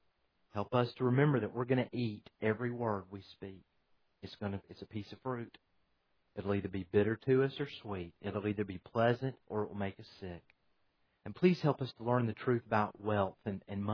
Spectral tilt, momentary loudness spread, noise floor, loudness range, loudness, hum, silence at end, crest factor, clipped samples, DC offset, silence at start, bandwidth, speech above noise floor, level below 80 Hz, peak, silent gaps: -6.5 dB/octave; 17 LU; -77 dBFS; 8 LU; -35 LUFS; none; 0 s; 20 dB; under 0.1%; under 0.1%; 0.55 s; 5.4 kHz; 42 dB; -70 dBFS; -14 dBFS; none